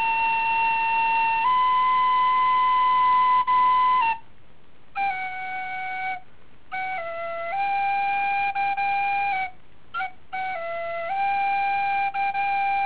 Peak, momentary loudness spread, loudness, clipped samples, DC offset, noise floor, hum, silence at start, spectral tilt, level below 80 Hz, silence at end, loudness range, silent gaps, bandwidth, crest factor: -14 dBFS; 12 LU; -23 LUFS; under 0.1%; 1%; -56 dBFS; none; 0 s; 1 dB/octave; -60 dBFS; 0 s; 8 LU; none; 4 kHz; 10 dB